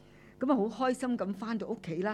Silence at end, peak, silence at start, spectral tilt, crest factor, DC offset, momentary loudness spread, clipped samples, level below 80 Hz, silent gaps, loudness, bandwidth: 0 s; -16 dBFS; 0.05 s; -6.5 dB/octave; 16 dB; under 0.1%; 7 LU; under 0.1%; -68 dBFS; none; -33 LUFS; 12 kHz